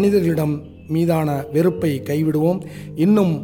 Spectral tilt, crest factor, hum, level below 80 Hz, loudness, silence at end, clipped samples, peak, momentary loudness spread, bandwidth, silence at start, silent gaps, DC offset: -8 dB/octave; 14 dB; none; -50 dBFS; -19 LUFS; 0 s; under 0.1%; -6 dBFS; 9 LU; 17 kHz; 0 s; none; under 0.1%